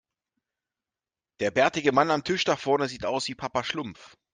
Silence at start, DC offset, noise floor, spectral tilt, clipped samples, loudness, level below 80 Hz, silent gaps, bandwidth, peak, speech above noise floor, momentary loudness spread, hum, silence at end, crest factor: 1.4 s; under 0.1%; under -90 dBFS; -4 dB/octave; under 0.1%; -26 LUFS; -64 dBFS; none; 9.8 kHz; -6 dBFS; over 64 dB; 9 LU; none; 0.25 s; 22 dB